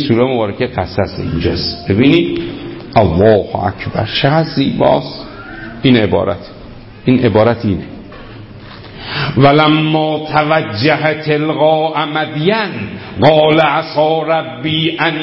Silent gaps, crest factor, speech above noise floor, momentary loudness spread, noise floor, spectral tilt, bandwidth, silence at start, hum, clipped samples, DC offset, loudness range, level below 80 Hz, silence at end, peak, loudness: none; 14 dB; 20 dB; 17 LU; -33 dBFS; -9 dB/octave; 5.8 kHz; 0 s; none; under 0.1%; under 0.1%; 3 LU; -36 dBFS; 0 s; 0 dBFS; -13 LUFS